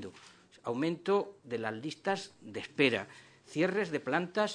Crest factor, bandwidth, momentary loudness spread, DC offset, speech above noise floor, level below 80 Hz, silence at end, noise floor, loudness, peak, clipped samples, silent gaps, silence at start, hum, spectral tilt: 22 dB; 10 kHz; 14 LU; under 0.1%; 25 dB; -78 dBFS; 0 s; -58 dBFS; -33 LUFS; -12 dBFS; under 0.1%; none; 0 s; none; -5 dB/octave